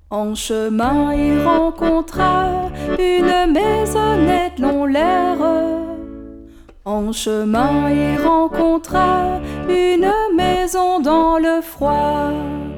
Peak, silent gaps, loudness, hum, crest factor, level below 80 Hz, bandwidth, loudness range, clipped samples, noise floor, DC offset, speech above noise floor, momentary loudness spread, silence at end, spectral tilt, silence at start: -2 dBFS; none; -17 LUFS; none; 14 dB; -32 dBFS; 18.5 kHz; 3 LU; under 0.1%; -40 dBFS; under 0.1%; 24 dB; 8 LU; 0 s; -5.5 dB/octave; 0.1 s